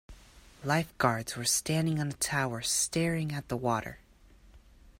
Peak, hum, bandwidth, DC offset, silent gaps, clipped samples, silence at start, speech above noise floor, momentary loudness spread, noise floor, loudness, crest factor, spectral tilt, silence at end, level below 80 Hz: -12 dBFS; none; 16 kHz; under 0.1%; none; under 0.1%; 0.1 s; 27 dB; 6 LU; -58 dBFS; -30 LUFS; 20 dB; -3.5 dB/octave; 0.1 s; -56 dBFS